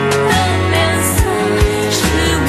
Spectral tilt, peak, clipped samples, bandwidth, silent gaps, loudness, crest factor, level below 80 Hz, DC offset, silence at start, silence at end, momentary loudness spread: -4.5 dB/octave; 0 dBFS; under 0.1%; 15 kHz; none; -14 LUFS; 14 dB; -22 dBFS; under 0.1%; 0 s; 0 s; 1 LU